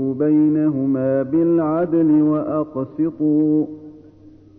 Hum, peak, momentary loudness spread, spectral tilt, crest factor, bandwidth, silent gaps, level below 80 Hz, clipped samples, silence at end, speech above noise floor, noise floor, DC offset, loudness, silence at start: none; -8 dBFS; 8 LU; -13 dB/octave; 10 dB; 2.8 kHz; none; -58 dBFS; under 0.1%; 0.6 s; 28 dB; -45 dBFS; under 0.1%; -18 LUFS; 0 s